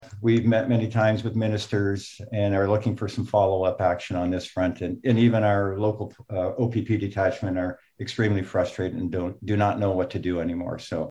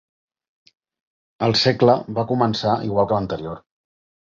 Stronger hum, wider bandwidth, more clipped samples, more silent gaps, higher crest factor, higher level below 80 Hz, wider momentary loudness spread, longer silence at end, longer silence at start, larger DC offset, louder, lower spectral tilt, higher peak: neither; first, 11 kHz vs 7.4 kHz; neither; neither; about the same, 16 dB vs 20 dB; about the same, -56 dBFS vs -52 dBFS; second, 9 LU vs 13 LU; second, 0 s vs 0.65 s; second, 0 s vs 1.4 s; neither; second, -25 LUFS vs -20 LUFS; first, -7.5 dB/octave vs -6 dB/octave; second, -8 dBFS vs -2 dBFS